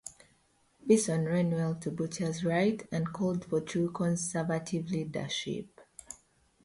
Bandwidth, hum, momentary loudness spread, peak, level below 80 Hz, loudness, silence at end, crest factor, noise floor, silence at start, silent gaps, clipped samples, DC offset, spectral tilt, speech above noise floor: 11.5 kHz; none; 20 LU; -12 dBFS; -66 dBFS; -31 LUFS; 0.5 s; 20 dB; -69 dBFS; 0.05 s; none; under 0.1%; under 0.1%; -5.5 dB/octave; 38 dB